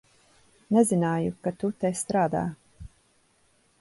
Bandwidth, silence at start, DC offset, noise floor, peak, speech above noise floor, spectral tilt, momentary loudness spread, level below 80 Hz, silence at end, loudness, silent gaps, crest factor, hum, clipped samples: 12 kHz; 0.7 s; under 0.1%; -65 dBFS; -8 dBFS; 40 dB; -6.5 dB/octave; 9 LU; -56 dBFS; 0.95 s; -26 LUFS; none; 20 dB; none; under 0.1%